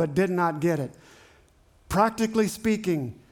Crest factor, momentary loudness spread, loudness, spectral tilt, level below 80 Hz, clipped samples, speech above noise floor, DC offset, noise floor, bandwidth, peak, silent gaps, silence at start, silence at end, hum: 18 dB; 7 LU; -25 LUFS; -6 dB/octave; -52 dBFS; under 0.1%; 34 dB; under 0.1%; -59 dBFS; 19 kHz; -8 dBFS; none; 0 s; 0.15 s; none